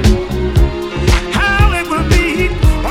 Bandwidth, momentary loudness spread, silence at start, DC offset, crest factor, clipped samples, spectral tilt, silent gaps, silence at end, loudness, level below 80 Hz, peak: 15.5 kHz; 4 LU; 0 s; under 0.1%; 12 dB; under 0.1%; -5.5 dB/octave; none; 0 s; -14 LUFS; -16 dBFS; 0 dBFS